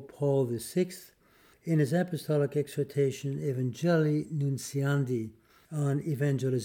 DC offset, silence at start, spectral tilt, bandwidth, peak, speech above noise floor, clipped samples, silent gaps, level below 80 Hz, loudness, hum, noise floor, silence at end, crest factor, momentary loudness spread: under 0.1%; 0 s; -7 dB/octave; 16.5 kHz; -16 dBFS; 33 dB; under 0.1%; none; -70 dBFS; -30 LUFS; none; -62 dBFS; 0 s; 14 dB; 7 LU